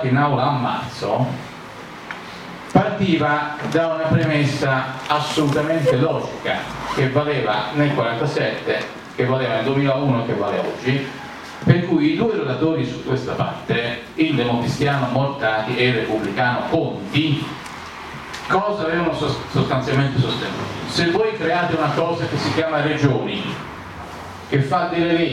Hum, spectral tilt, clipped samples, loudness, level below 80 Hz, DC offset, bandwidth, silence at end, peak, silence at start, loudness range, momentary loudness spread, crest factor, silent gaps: none; -6.5 dB/octave; under 0.1%; -20 LUFS; -50 dBFS; under 0.1%; 13 kHz; 0 s; 0 dBFS; 0 s; 2 LU; 13 LU; 20 dB; none